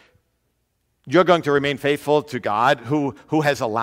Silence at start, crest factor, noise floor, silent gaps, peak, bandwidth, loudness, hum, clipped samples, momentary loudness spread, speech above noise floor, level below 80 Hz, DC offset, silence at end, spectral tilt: 1.05 s; 18 dB; -70 dBFS; none; -2 dBFS; 16 kHz; -20 LUFS; none; under 0.1%; 7 LU; 51 dB; -60 dBFS; under 0.1%; 0 s; -6 dB/octave